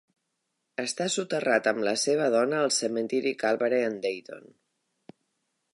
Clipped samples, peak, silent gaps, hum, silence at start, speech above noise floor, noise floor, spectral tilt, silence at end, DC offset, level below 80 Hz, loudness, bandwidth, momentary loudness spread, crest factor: under 0.1%; -10 dBFS; none; none; 0.8 s; 53 dB; -80 dBFS; -3 dB/octave; 1.35 s; under 0.1%; -84 dBFS; -27 LUFS; 11.5 kHz; 10 LU; 20 dB